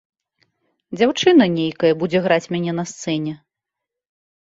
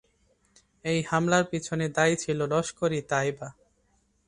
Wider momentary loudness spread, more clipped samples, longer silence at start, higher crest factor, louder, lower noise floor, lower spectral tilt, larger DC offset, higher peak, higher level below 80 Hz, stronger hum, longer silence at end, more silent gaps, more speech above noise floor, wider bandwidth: first, 13 LU vs 8 LU; neither; about the same, 0.9 s vs 0.85 s; about the same, 18 dB vs 20 dB; first, -18 LUFS vs -27 LUFS; first, -84 dBFS vs -69 dBFS; about the same, -5.5 dB/octave vs -5 dB/octave; neither; first, -2 dBFS vs -8 dBFS; about the same, -62 dBFS vs -60 dBFS; neither; first, 1.15 s vs 0.75 s; neither; first, 66 dB vs 42 dB; second, 7.8 kHz vs 11 kHz